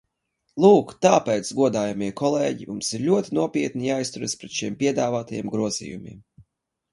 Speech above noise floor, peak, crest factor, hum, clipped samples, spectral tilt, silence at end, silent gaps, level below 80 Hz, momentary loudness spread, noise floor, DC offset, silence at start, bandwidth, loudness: 52 dB; -2 dBFS; 20 dB; none; under 0.1%; -5 dB/octave; 0.5 s; none; -62 dBFS; 11 LU; -74 dBFS; under 0.1%; 0.55 s; 11.5 kHz; -23 LUFS